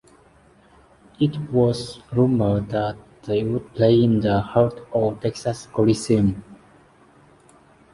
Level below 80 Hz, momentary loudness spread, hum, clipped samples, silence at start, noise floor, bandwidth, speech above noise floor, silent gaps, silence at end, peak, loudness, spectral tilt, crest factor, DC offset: -48 dBFS; 9 LU; none; under 0.1%; 1.2 s; -54 dBFS; 11.5 kHz; 33 dB; none; 1.4 s; -2 dBFS; -21 LUFS; -7.5 dB/octave; 20 dB; under 0.1%